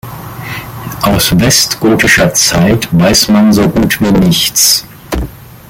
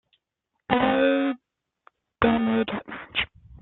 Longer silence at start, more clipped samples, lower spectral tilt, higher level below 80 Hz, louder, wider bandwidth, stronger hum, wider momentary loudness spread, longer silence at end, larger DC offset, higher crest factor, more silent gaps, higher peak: second, 0.05 s vs 0.7 s; neither; second, -3.5 dB/octave vs -9.5 dB/octave; first, -28 dBFS vs -52 dBFS; first, -8 LUFS vs -24 LUFS; first, 17.5 kHz vs 4.2 kHz; neither; first, 15 LU vs 11 LU; about the same, 0.15 s vs 0.1 s; neither; second, 10 dB vs 22 dB; neither; first, 0 dBFS vs -4 dBFS